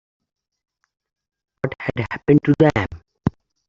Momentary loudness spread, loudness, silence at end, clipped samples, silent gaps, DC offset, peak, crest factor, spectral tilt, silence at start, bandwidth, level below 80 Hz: 13 LU; -20 LUFS; 0.4 s; under 0.1%; none; under 0.1%; -2 dBFS; 20 dB; -8.5 dB/octave; 1.65 s; 7.4 kHz; -46 dBFS